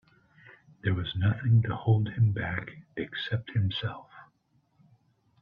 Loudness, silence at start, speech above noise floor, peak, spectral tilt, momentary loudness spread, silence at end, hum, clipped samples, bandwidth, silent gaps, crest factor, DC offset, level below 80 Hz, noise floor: -29 LUFS; 0.45 s; 43 dB; -12 dBFS; -9 dB/octave; 12 LU; 1.2 s; none; under 0.1%; 5 kHz; none; 18 dB; under 0.1%; -58 dBFS; -70 dBFS